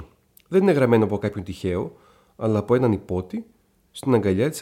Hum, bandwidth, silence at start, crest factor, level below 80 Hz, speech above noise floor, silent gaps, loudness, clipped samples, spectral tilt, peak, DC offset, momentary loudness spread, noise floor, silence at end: none; 16.5 kHz; 0 s; 16 dB; -52 dBFS; 29 dB; none; -22 LUFS; under 0.1%; -7.5 dB/octave; -6 dBFS; under 0.1%; 14 LU; -50 dBFS; 0 s